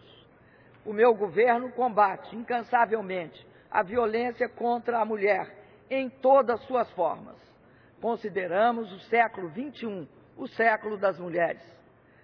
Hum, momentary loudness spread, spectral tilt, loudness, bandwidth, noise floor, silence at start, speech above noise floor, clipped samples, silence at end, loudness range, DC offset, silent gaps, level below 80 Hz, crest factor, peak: none; 14 LU; -8 dB/octave; -27 LUFS; 5.4 kHz; -57 dBFS; 0.85 s; 30 dB; under 0.1%; 0.65 s; 3 LU; under 0.1%; none; -70 dBFS; 18 dB; -8 dBFS